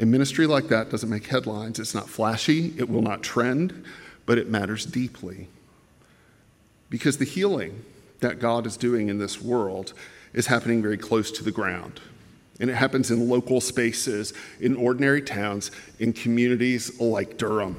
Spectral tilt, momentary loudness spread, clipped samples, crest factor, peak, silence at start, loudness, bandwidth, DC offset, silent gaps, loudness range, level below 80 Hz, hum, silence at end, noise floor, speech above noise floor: -5 dB/octave; 13 LU; under 0.1%; 20 dB; -6 dBFS; 0 s; -25 LUFS; 16 kHz; under 0.1%; none; 5 LU; -62 dBFS; none; 0 s; -58 dBFS; 34 dB